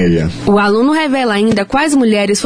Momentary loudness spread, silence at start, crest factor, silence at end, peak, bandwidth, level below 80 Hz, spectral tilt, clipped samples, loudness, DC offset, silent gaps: 2 LU; 0 s; 10 dB; 0 s; -2 dBFS; 11 kHz; -36 dBFS; -5 dB/octave; under 0.1%; -12 LUFS; under 0.1%; none